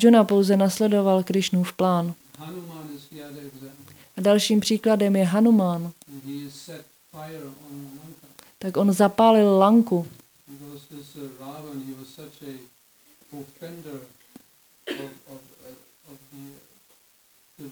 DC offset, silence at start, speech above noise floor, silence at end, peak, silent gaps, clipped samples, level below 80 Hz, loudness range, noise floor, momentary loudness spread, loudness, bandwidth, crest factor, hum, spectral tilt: under 0.1%; 0 s; 38 dB; 0 s; -4 dBFS; none; under 0.1%; -72 dBFS; 20 LU; -60 dBFS; 25 LU; -20 LUFS; over 20 kHz; 20 dB; none; -6 dB/octave